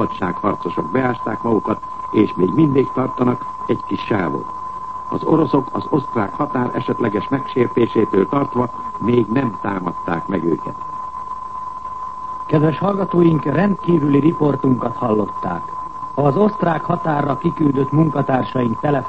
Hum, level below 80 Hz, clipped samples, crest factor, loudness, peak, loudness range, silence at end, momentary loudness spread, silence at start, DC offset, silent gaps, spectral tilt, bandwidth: none; -48 dBFS; under 0.1%; 16 dB; -19 LUFS; -2 dBFS; 4 LU; 0 s; 12 LU; 0 s; 1%; none; -9.5 dB/octave; 8.2 kHz